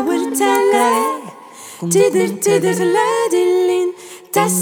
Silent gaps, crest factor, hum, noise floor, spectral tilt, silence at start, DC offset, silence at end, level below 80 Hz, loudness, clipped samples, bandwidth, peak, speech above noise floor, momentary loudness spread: none; 14 dB; none; -36 dBFS; -4 dB/octave; 0 s; under 0.1%; 0 s; -70 dBFS; -15 LUFS; under 0.1%; 19.5 kHz; -2 dBFS; 22 dB; 14 LU